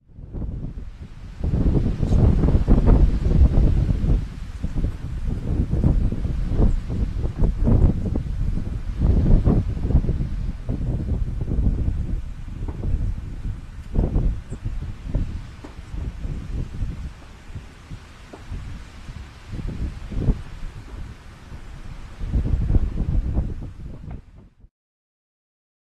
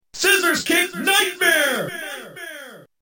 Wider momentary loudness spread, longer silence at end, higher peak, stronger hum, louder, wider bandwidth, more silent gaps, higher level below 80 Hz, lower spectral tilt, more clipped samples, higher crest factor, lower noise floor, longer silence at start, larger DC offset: first, 21 LU vs 18 LU; first, 1.45 s vs 0.2 s; about the same, -4 dBFS vs -4 dBFS; neither; second, -24 LUFS vs -17 LUFS; second, 7.8 kHz vs 17 kHz; neither; first, -24 dBFS vs -62 dBFS; first, -9 dB/octave vs -1 dB/octave; neither; about the same, 18 dB vs 18 dB; first, -47 dBFS vs -40 dBFS; about the same, 0.15 s vs 0.15 s; neither